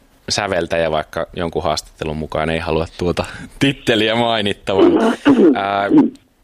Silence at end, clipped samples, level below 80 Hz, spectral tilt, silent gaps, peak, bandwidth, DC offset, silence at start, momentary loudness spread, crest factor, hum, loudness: 0.3 s; under 0.1%; -42 dBFS; -5 dB/octave; none; -2 dBFS; 14 kHz; under 0.1%; 0.3 s; 10 LU; 14 dB; none; -17 LUFS